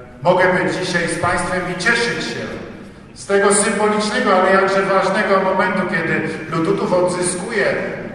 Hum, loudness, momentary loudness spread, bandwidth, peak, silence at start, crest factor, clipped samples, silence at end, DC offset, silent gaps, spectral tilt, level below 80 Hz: none; -17 LUFS; 9 LU; 12 kHz; 0 dBFS; 0 s; 16 dB; under 0.1%; 0 s; under 0.1%; none; -4 dB/octave; -46 dBFS